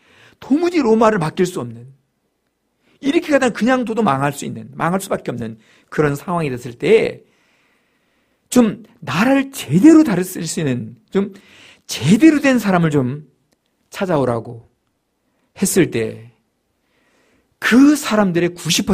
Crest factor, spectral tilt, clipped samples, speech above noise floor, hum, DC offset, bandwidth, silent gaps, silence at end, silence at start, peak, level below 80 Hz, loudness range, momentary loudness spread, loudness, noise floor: 18 dB; -5.5 dB/octave; under 0.1%; 53 dB; none; under 0.1%; 15.5 kHz; none; 0 s; 0.4 s; 0 dBFS; -52 dBFS; 6 LU; 15 LU; -16 LUFS; -69 dBFS